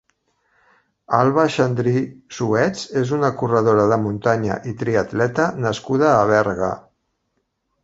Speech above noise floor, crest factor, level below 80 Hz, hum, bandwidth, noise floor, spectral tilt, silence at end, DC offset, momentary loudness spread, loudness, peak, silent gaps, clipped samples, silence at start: 53 dB; 18 dB; -52 dBFS; none; 8 kHz; -72 dBFS; -6.5 dB/octave; 1.05 s; under 0.1%; 9 LU; -19 LUFS; 0 dBFS; none; under 0.1%; 1.1 s